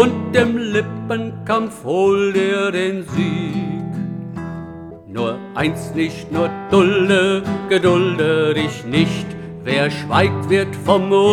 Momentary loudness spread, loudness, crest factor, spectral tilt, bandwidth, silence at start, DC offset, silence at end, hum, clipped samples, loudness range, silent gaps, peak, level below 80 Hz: 11 LU; -18 LUFS; 16 dB; -6 dB/octave; 13 kHz; 0 s; under 0.1%; 0 s; none; under 0.1%; 7 LU; none; 0 dBFS; -50 dBFS